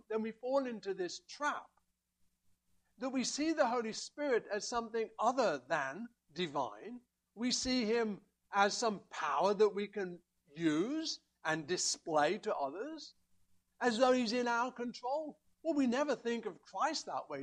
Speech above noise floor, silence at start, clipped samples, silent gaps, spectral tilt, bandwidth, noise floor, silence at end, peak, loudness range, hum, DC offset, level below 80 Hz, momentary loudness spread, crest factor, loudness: 42 dB; 0.1 s; under 0.1%; none; -3 dB/octave; 11 kHz; -78 dBFS; 0 s; -16 dBFS; 3 LU; none; under 0.1%; -72 dBFS; 12 LU; 22 dB; -36 LUFS